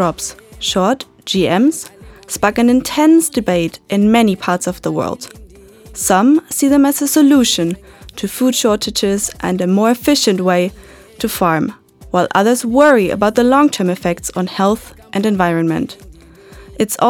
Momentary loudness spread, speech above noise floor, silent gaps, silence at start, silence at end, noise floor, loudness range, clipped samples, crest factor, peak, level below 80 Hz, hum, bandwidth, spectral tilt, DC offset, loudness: 12 LU; 26 dB; none; 0 s; 0 s; -40 dBFS; 2 LU; under 0.1%; 14 dB; 0 dBFS; -44 dBFS; none; 19 kHz; -4.5 dB/octave; under 0.1%; -14 LUFS